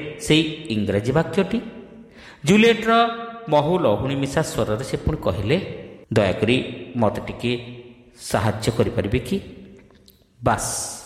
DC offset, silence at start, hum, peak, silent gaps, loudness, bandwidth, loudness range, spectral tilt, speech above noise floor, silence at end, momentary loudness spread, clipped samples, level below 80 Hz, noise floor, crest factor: under 0.1%; 0 s; none; -4 dBFS; none; -21 LUFS; 15 kHz; 5 LU; -5 dB/octave; 32 dB; 0 s; 11 LU; under 0.1%; -42 dBFS; -53 dBFS; 18 dB